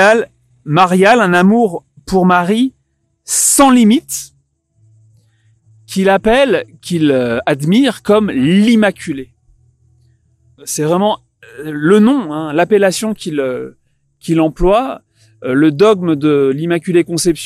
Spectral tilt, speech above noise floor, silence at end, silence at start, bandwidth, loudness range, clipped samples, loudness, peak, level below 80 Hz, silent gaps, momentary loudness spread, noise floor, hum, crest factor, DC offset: -4.5 dB/octave; 51 dB; 0 s; 0 s; 15 kHz; 4 LU; under 0.1%; -12 LUFS; 0 dBFS; -38 dBFS; none; 15 LU; -63 dBFS; none; 14 dB; under 0.1%